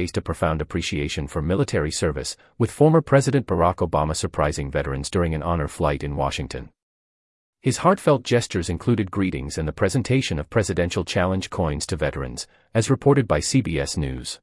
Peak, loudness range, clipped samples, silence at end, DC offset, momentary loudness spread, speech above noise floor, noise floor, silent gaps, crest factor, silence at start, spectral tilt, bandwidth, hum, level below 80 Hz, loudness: -4 dBFS; 3 LU; under 0.1%; 0.05 s; under 0.1%; 8 LU; over 68 dB; under -90 dBFS; 6.83-7.53 s; 18 dB; 0 s; -5.5 dB/octave; 12 kHz; none; -40 dBFS; -23 LUFS